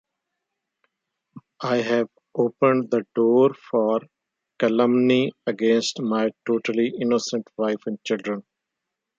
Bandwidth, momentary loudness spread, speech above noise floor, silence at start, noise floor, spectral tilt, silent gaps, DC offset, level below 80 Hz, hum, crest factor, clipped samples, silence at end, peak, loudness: 7.8 kHz; 9 LU; 62 dB; 1.35 s; -83 dBFS; -5.5 dB/octave; none; under 0.1%; -74 dBFS; none; 20 dB; under 0.1%; 0.8 s; -4 dBFS; -22 LUFS